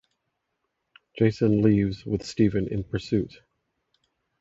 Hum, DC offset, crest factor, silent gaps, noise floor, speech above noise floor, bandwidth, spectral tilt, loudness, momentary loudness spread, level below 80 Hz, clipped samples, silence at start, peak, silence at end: none; under 0.1%; 20 dB; none; -79 dBFS; 55 dB; 7.8 kHz; -8 dB/octave; -25 LUFS; 10 LU; -48 dBFS; under 0.1%; 1.15 s; -8 dBFS; 1.1 s